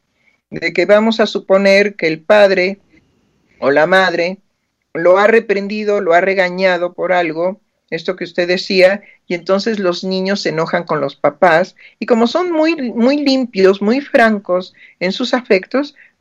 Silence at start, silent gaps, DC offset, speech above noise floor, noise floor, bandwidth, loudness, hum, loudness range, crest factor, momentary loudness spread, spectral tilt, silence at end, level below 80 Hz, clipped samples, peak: 0.5 s; none; under 0.1%; 53 dB; -66 dBFS; 9.8 kHz; -14 LUFS; none; 3 LU; 14 dB; 11 LU; -5.5 dB/octave; 0.3 s; -62 dBFS; under 0.1%; 0 dBFS